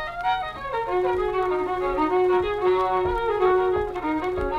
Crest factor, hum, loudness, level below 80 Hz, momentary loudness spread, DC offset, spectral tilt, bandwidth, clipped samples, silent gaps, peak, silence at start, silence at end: 12 dB; none; -23 LUFS; -42 dBFS; 6 LU; under 0.1%; -7 dB/octave; 6.6 kHz; under 0.1%; none; -10 dBFS; 0 s; 0 s